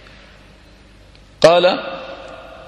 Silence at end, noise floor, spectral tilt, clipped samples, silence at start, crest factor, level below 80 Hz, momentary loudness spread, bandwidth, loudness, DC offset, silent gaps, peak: 0.25 s; -45 dBFS; -4 dB/octave; under 0.1%; 1.4 s; 20 dB; -48 dBFS; 23 LU; 12 kHz; -14 LUFS; under 0.1%; none; 0 dBFS